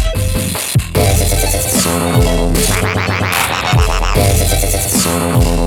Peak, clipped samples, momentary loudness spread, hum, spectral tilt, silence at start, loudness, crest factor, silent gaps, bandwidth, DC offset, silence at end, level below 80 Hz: 0 dBFS; under 0.1%; 3 LU; none; -4 dB/octave; 0 s; -13 LUFS; 12 dB; none; 19.5 kHz; under 0.1%; 0 s; -20 dBFS